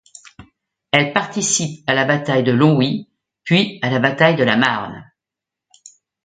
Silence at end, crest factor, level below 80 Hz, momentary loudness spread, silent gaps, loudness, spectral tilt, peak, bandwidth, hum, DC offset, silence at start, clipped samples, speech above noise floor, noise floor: 1.2 s; 18 dB; -60 dBFS; 7 LU; none; -16 LUFS; -4 dB/octave; 0 dBFS; 9.6 kHz; none; under 0.1%; 0.4 s; under 0.1%; 69 dB; -85 dBFS